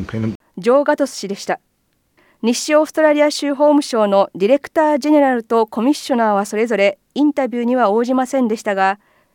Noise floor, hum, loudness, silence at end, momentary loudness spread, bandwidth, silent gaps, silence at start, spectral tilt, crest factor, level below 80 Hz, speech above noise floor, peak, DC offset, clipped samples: -64 dBFS; none; -16 LUFS; 0.4 s; 9 LU; 17 kHz; 0.35-0.40 s; 0 s; -5 dB/octave; 14 dB; -58 dBFS; 49 dB; -2 dBFS; under 0.1%; under 0.1%